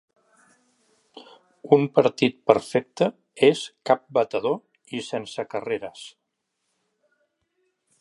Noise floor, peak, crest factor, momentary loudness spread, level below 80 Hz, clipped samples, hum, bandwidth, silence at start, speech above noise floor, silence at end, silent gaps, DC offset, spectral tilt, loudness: -78 dBFS; 0 dBFS; 24 dB; 12 LU; -70 dBFS; under 0.1%; none; 11.5 kHz; 1.65 s; 56 dB; 1.9 s; none; under 0.1%; -5.5 dB/octave; -23 LUFS